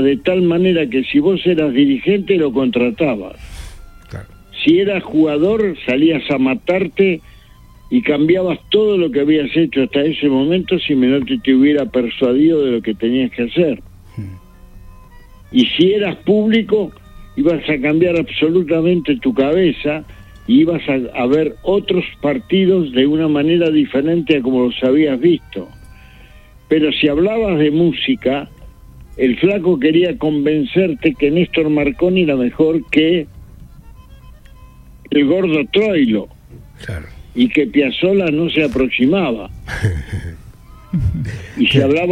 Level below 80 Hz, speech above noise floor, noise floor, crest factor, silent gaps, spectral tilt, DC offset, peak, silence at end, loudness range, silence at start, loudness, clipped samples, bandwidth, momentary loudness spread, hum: -40 dBFS; 28 dB; -42 dBFS; 14 dB; none; -7.5 dB/octave; under 0.1%; 0 dBFS; 0 s; 3 LU; 0 s; -15 LUFS; under 0.1%; 9.8 kHz; 12 LU; none